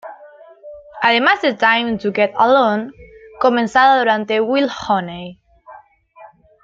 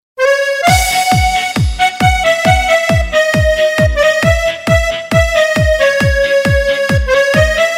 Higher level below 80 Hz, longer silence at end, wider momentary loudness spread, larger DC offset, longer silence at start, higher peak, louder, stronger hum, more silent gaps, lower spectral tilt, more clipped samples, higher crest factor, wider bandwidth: second, -56 dBFS vs -22 dBFS; first, 0.4 s vs 0 s; first, 18 LU vs 3 LU; neither; about the same, 0.05 s vs 0.15 s; about the same, -2 dBFS vs 0 dBFS; second, -15 LUFS vs -11 LUFS; neither; neither; about the same, -5 dB/octave vs -4.5 dB/octave; neither; about the same, 16 dB vs 12 dB; second, 7.6 kHz vs 16.5 kHz